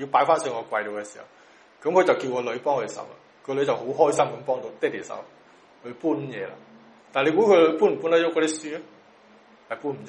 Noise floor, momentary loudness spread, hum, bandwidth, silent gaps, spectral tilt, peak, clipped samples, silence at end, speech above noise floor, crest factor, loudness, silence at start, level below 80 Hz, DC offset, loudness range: -53 dBFS; 18 LU; none; 11.5 kHz; none; -4.5 dB/octave; -4 dBFS; under 0.1%; 0 s; 30 dB; 20 dB; -24 LUFS; 0 s; -74 dBFS; under 0.1%; 5 LU